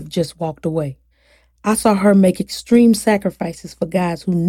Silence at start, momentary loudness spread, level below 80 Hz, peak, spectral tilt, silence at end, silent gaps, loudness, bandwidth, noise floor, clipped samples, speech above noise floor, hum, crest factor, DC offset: 0 s; 13 LU; -48 dBFS; -2 dBFS; -6 dB/octave; 0 s; none; -17 LUFS; 16 kHz; -56 dBFS; under 0.1%; 39 dB; none; 16 dB; under 0.1%